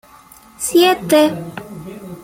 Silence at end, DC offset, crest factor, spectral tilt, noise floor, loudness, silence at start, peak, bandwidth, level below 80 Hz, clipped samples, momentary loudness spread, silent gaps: 0 s; under 0.1%; 16 dB; -4 dB/octave; -44 dBFS; -14 LUFS; 0.6 s; -2 dBFS; 16.5 kHz; -54 dBFS; under 0.1%; 20 LU; none